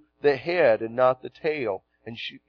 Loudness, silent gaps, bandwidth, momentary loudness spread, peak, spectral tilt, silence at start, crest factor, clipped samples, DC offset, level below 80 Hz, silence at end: -24 LUFS; none; 5.4 kHz; 14 LU; -8 dBFS; -7 dB/octave; 0.25 s; 18 dB; under 0.1%; under 0.1%; -66 dBFS; 0.1 s